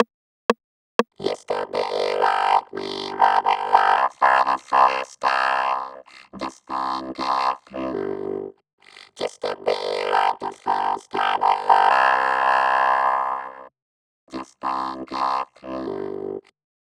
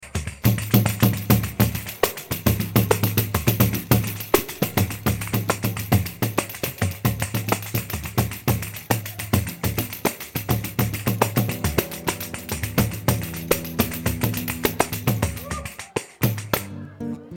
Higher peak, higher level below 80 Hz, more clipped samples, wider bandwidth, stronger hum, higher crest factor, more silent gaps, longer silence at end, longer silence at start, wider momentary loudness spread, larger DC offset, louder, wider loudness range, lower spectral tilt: first, 0 dBFS vs -6 dBFS; second, -64 dBFS vs -40 dBFS; neither; second, 11.5 kHz vs 17.5 kHz; neither; about the same, 22 dB vs 18 dB; first, 0.14-0.49 s, 0.64-0.99 s, 8.73-8.78 s, 13.82-14.27 s vs none; first, 0.45 s vs 0 s; about the same, 0 s vs 0 s; first, 14 LU vs 7 LU; neither; about the same, -22 LUFS vs -23 LUFS; first, 8 LU vs 4 LU; second, -3.5 dB/octave vs -5 dB/octave